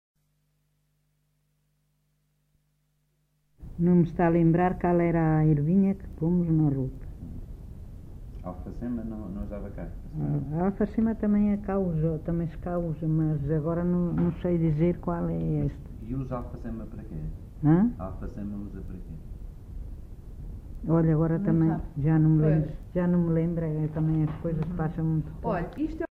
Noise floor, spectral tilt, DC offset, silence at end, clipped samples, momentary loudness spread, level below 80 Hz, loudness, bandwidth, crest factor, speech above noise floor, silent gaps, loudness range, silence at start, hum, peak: -72 dBFS; -11.5 dB/octave; under 0.1%; 0.05 s; under 0.1%; 20 LU; -42 dBFS; -27 LUFS; 3.2 kHz; 16 dB; 46 dB; none; 8 LU; 3.6 s; 50 Hz at -55 dBFS; -12 dBFS